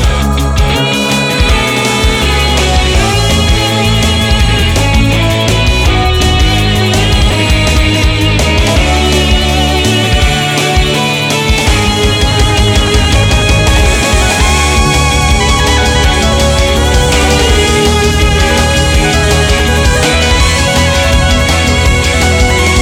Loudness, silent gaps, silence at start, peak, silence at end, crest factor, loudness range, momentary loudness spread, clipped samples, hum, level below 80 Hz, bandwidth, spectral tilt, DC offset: -9 LUFS; none; 0 s; 0 dBFS; 0 s; 8 dB; 1 LU; 1 LU; under 0.1%; none; -14 dBFS; 17 kHz; -4 dB/octave; under 0.1%